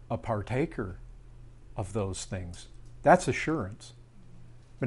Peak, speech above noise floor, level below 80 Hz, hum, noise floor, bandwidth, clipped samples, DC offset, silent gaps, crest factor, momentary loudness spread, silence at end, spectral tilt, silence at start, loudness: -6 dBFS; 19 dB; -50 dBFS; none; -49 dBFS; 11.5 kHz; under 0.1%; under 0.1%; none; 26 dB; 24 LU; 0 s; -6 dB/octave; 0 s; -30 LUFS